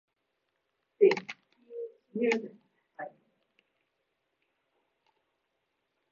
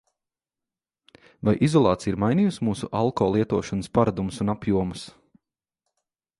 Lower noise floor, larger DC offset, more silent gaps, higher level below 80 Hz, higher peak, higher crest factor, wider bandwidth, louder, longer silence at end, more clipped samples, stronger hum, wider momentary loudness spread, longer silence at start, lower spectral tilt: second, -81 dBFS vs -89 dBFS; neither; neither; second, -90 dBFS vs -50 dBFS; second, -12 dBFS vs -4 dBFS; about the same, 24 dB vs 20 dB; second, 7 kHz vs 11.5 kHz; second, -29 LUFS vs -24 LUFS; first, 3 s vs 1.3 s; neither; neither; first, 22 LU vs 8 LU; second, 1 s vs 1.45 s; second, -3.5 dB/octave vs -7 dB/octave